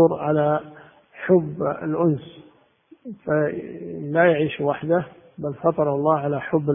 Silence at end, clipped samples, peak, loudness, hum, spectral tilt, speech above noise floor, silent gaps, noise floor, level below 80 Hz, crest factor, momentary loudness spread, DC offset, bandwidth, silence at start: 0 s; under 0.1%; -4 dBFS; -22 LUFS; none; -12 dB/octave; 33 dB; none; -55 dBFS; -60 dBFS; 18 dB; 14 LU; under 0.1%; 3.7 kHz; 0 s